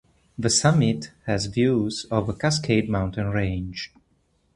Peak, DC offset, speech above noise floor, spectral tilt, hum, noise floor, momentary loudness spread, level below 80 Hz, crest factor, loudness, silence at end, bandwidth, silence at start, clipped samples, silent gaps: -4 dBFS; under 0.1%; 43 dB; -5 dB/octave; none; -66 dBFS; 11 LU; -44 dBFS; 20 dB; -23 LUFS; 0.7 s; 11.5 kHz; 0.4 s; under 0.1%; none